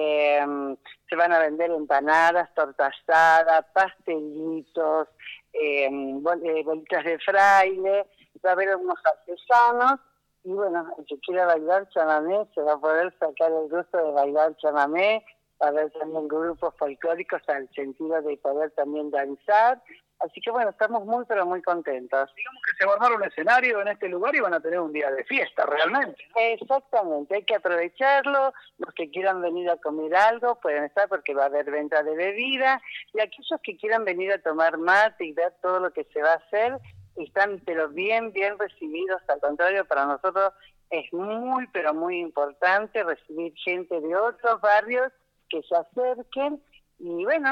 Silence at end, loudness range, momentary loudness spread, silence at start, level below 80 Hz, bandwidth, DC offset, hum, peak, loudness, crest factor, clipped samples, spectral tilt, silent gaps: 0 s; 5 LU; 11 LU; 0 s; -72 dBFS; 9.4 kHz; under 0.1%; 50 Hz at -80 dBFS; -8 dBFS; -24 LUFS; 16 dB; under 0.1%; -4 dB/octave; none